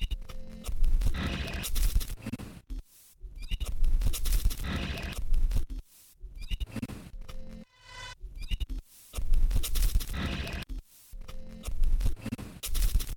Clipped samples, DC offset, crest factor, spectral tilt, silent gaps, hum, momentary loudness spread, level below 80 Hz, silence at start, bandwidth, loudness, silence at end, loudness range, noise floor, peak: under 0.1%; under 0.1%; 16 dB; -4 dB/octave; none; none; 16 LU; -30 dBFS; 0 s; 18.5 kHz; -35 LUFS; 0 s; 5 LU; -48 dBFS; -14 dBFS